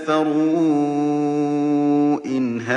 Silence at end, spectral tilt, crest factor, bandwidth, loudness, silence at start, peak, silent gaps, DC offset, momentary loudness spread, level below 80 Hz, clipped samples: 0 s; -7 dB/octave; 12 dB; 8.6 kHz; -19 LUFS; 0 s; -6 dBFS; none; under 0.1%; 3 LU; -70 dBFS; under 0.1%